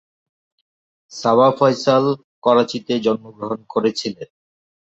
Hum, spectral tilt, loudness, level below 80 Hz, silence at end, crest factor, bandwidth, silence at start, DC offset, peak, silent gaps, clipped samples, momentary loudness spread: none; -5.5 dB/octave; -18 LUFS; -64 dBFS; 0.7 s; 18 dB; 8 kHz; 1.1 s; under 0.1%; -2 dBFS; 2.24-2.42 s; under 0.1%; 13 LU